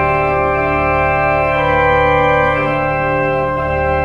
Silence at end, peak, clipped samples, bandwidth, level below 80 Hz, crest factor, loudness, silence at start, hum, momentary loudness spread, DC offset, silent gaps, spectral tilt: 0 s; -2 dBFS; under 0.1%; 7.6 kHz; -30 dBFS; 12 dB; -14 LUFS; 0 s; none; 4 LU; under 0.1%; none; -7.5 dB/octave